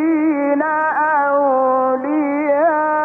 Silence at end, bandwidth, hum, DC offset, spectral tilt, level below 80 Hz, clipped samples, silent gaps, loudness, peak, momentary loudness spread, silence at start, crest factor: 0 s; 3.3 kHz; none; under 0.1%; -8 dB/octave; -76 dBFS; under 0.1%; none; -16 LUFS; -6 dBFS; 3 LU; 0 s; 10 dB